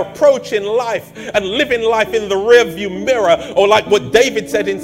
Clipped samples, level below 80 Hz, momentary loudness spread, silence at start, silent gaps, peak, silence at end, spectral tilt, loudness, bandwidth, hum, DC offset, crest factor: 0.2%; -46 dBFS; 8 LU; 0 s; none; 0 dBFS; 0 s; -3.5 dB/octave; -14 LUFS; 16.5 kHz; none; under 0.1%; 14 dB